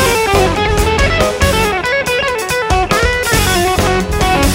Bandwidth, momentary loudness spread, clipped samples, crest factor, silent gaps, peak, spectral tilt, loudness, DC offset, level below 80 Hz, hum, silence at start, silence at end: 16.5 kHz; 3 LU; under 0.1%; 12 dB; none; 0 dBFS; -4 dB/octave; -13 LUFS; under 0.1%; -20 dBFS; none; 0 s; 0 s